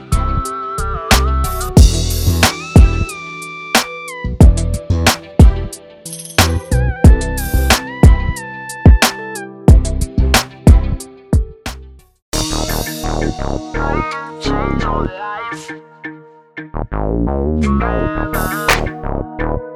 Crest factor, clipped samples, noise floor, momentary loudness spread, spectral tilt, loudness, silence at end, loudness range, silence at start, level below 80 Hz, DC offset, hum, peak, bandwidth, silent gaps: 14 dB; 0.3%; -36 dBFS; 15 LU; -5 dB/octave; -15 LUFS; 0 s; 8 LU; 0 s; -16 dBFS; under 0.1%; none; 0 dBFS; 18 kHz; 12.22-12.32 s